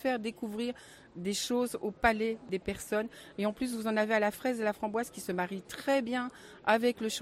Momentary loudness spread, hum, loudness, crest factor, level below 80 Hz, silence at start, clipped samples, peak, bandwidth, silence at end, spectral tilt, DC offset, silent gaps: 9 LU; none; -33 LUFS; 22 dB; -58 dBFS; 0 s; under 0.1%; -12 dBFS; 16 kHz; 0 s; -4 dB/octave; under 0.1%; none